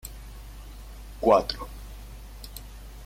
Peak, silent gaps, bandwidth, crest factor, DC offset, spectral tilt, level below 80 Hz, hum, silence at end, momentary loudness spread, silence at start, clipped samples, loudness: -8 dBFS; none; 16.5 kHz; 22 dB; under 0.1%; -5 dB/octave; -42 dBFS; none; 0 s; 23 LU; 0.05 s; under 0.1%; -24 LUFS